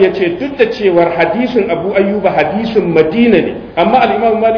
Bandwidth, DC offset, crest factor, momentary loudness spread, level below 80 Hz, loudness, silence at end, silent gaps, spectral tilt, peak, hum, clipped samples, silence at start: 5.4 kHz; under 0.1%; 12 dB; 4 LU; -42 dBFS; -12 LUFS; 0 s; none; -8 dB/octave; 0 dBFS; none; 0.2%; 0 s